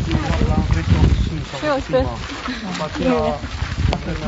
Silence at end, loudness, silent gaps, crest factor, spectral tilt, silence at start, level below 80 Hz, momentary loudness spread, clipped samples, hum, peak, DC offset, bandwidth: 0 s; -20 LUFS; none; 16 dB; -6.5 dB/octave; 0 s; -26 dBFS; 9 LU; under 0.1%; none; -2 dBFS; under 0.1%; 8 kHz